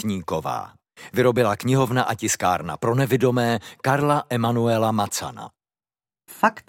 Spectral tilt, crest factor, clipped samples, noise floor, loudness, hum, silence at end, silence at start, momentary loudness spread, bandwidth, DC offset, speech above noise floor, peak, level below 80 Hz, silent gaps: -5.5 dB/octave; 20 dB; under 0.1%; under -90 dBFS; -22 LUFS; none; 0.1 s; 0 s; 10 LU; 17 kHz; under 0.1%; over 68 dB; -2 dBFS; -58 dBFS; none